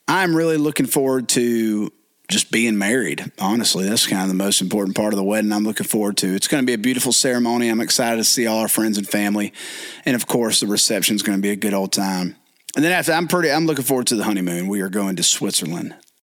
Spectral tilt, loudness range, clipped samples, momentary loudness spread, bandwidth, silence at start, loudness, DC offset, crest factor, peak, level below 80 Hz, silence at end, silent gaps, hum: -3 dB/octave; 2 LU; under 0.1%; 7 LU; 19 kHz; 0.1 s; -18 LUFS; under 0.1%; 14 dB; -6 dBFS; -66 dBFS; 0.3 s; none; none